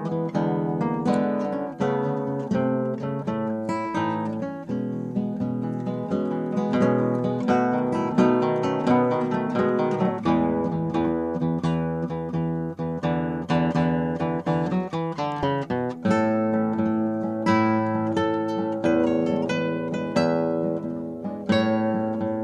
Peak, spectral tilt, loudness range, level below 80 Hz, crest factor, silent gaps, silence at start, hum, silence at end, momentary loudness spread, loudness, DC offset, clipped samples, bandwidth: -8 dBFS; -8 dB/octave; 4 LU; -56 dBFS; 16 dB; none; 0 s; none; 0 s; 7 LU; -25 LUFS; under 0.1%; under 0.1%; 9.6 kHz